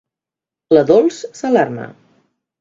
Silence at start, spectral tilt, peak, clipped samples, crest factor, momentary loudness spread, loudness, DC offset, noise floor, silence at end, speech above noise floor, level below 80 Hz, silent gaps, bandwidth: 0.7 s; -6 dB/octave; 0 dBFS; under 0.1%; 16 dB; 16 LU; -15 LUFS; under 0.1%; -87 dBFS; 0.7 s; 73 dB; -60 dBFS; none; 7.8 kHz